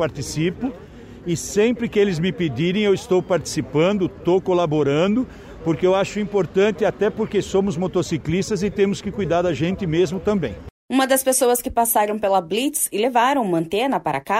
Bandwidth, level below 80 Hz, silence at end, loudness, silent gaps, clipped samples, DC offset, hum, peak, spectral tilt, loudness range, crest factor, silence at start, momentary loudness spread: 16 kHz; -46 dBFS; 0 s; -20 LUFS; 10.71-10.89 s; under 0.1%; under 0.1%; none; -6 dBFS; -5 dB/octave; 2 LU; 14 dB; 0 s; 6 LU